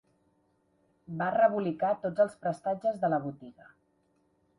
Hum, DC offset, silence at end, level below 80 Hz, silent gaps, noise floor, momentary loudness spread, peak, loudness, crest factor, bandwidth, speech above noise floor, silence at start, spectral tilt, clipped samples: none; under 0.1%; 1.05 s; -72 dBFS; none; -72 dBFS; 12 LU; -12 dBFS; -29 LUFS; 20 dB; 11 kHz; 42 dB; 1.1 s; -8 dB/octave; under 0.1%